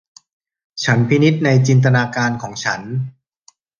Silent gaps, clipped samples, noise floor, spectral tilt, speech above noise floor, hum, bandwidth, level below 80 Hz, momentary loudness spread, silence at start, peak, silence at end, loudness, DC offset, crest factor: none; under 0.1%; -55 dBFS; -6 dB/octave; 39 dB; none; 7.2 kHz; -56 dBFS; 12 LU; 0.75 s; -2 dBFS; 0.7 s; -16 LUFS; under 0.1%; 16 dB